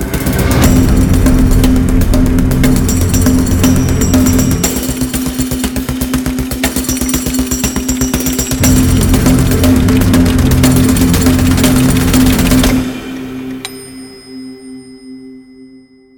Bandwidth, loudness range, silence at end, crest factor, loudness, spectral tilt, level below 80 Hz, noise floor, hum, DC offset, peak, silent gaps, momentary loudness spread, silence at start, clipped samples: 19.5 kHz; 5 LU; 0.5 s; 10 dB; -11 LUFS; -5 dB/octave; -18 dBFS; -40 dBFS; none; under 0.1%; 0 dBFS; none; 15 LU; 0 s; under 0.1%